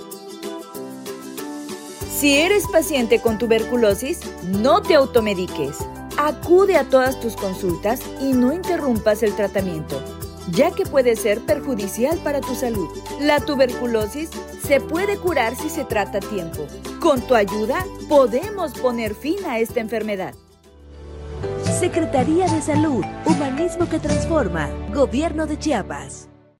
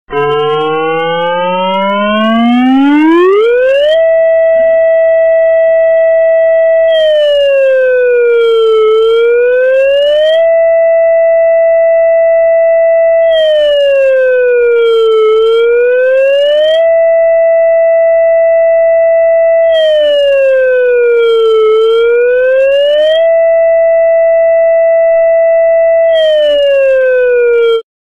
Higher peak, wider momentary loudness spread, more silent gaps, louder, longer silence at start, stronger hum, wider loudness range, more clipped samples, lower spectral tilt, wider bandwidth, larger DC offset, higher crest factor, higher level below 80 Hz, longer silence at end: about the same, -2 dBFS vs -4 dBFS; first, 15 LU vs 1 LU; neither; second, -20 LUFS vs -8 LUFS; about the same, 0 s vs 0.1 s; neither; first, 4 LU vs 0 LU; neither; about the same, -5 dB/octave vs -5.5 dB/octave; first, 16.5 kHz vs 5.4 kHz; second, under 0.1% vs 0.7%; first, 18 dB vs 4 dB; first, -40 dBFS vs -48 dBFS; about the same, 0.35 s vs 0.35 s